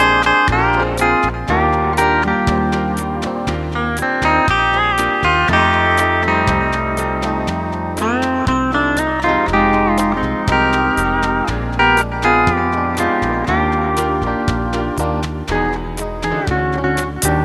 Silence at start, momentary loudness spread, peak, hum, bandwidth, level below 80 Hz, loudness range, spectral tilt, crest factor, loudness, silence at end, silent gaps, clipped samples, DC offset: 0 s; 7 LU; 0 dBFS; none; 14 kHz; -28 dBFS; 4 LU; -5.5 dB/octave; 16 dB; -16 LUFS; 0 s; none; under 0.1%; 0.1%